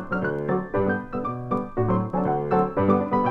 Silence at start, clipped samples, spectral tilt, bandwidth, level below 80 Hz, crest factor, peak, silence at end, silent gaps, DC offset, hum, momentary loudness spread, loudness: 0 s; under 0.1%; -10 dB/octave; 4.9 kHz; -46 dBFS; 16 dB; -8 dBFS; 0 s; none; under 0.1%; none; 6 LU; -24 LUFS